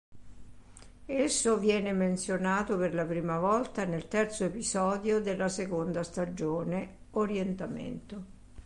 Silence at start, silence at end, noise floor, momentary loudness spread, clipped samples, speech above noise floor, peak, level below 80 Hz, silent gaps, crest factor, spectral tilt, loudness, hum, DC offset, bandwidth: 0.1 s; 0 s; -51 dBFS; 10 LU; under 0.1%; 20 dB; -16 dBFS; -56 dBFS; none; 16 dB; -5 dB/octave; -31 LUFS; none; under 0.1%; 11.5 kHz